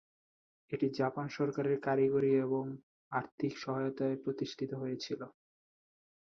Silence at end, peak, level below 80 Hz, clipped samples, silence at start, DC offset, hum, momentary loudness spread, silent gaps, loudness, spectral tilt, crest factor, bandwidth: 0.9 s; -18 dBFS; -76 dBFS; under 0.1%; 0.7 s; under 0.1%; none; 12 LU; 2.83-3.11 s, 3.32-3.38 s; -35 LUFS; -7 dB/octave; 16 dB; 6.8 kHz